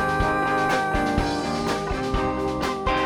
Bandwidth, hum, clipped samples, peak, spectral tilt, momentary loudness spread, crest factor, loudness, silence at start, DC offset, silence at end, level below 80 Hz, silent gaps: 18.5 kHz; none; under 0.1%; -8 dBFS; -5 dB/octave; 4 LU; 14 dB; -24 LUFS; 0 s; under 0.1%; 0 s; -34 dBFS; none